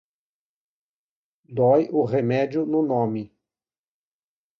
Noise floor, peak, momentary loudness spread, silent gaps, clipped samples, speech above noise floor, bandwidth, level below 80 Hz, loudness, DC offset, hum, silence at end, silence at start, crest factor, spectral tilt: under -90 dBFS; -8 dBFS; 14 LU; none; under 0.1%; over 69 dB; 6.6 kHz; -66 dBFS; -22 LUFS; under 0.1%; none; 1.35 s; 1.5 s; 18 dB; -9.5 dB/octave